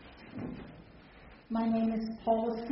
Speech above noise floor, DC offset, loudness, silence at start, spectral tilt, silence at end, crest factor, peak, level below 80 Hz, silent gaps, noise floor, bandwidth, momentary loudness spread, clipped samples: 24 dB; under 0.1%; -33 LUFS; 0 s; -6.5 dB/octave; 0 s; 16 dB; -18 dBFS; -58 dBFS; none; -55 dBFS; 5.8 kHz; 23 LU; under 0.1%